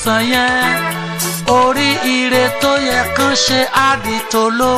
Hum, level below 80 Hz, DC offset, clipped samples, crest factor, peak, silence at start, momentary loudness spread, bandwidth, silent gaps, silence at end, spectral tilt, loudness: none; -42 dBFS; under 0.1%; under 0.1%; 14 dB; 0 dBFS; 0 s; 5 LU; 15.5 kHz; none; 0 s; -3 dB/octave; -13 LUFS